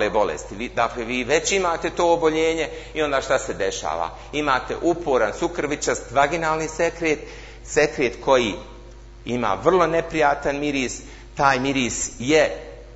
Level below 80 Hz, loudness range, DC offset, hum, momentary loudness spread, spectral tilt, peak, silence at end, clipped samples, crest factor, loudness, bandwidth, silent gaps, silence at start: -42 dBFS; 2 LU; under 0.1%; none; 9 LU; -3.5 dB/octave; -2 dBFS; 0 s; under 0.1%; 20 dB; -22 LUFS; 8 kHz; none; 0 s